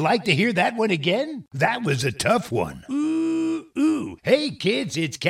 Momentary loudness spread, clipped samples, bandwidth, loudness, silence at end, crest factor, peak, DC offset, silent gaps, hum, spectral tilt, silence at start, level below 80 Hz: 7 LU; under 0.1%; 15.5 kHz; -23 LUFS; 0 s; 18 dB; -4 dBFS; under 0.1%; none; none; -5 dB/octave; 0 s; -56 dBFS